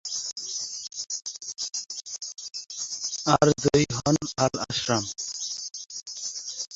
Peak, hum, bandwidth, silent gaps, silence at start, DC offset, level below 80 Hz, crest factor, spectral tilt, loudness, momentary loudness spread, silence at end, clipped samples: -2 dBFS; none; 8.2 kHz; none; 0.05 s; under 0.1%; -56 dBFS; 26 dB; -3.5 dB/octave; -27 LUFS; 13 LU; 0 s; under 0.1%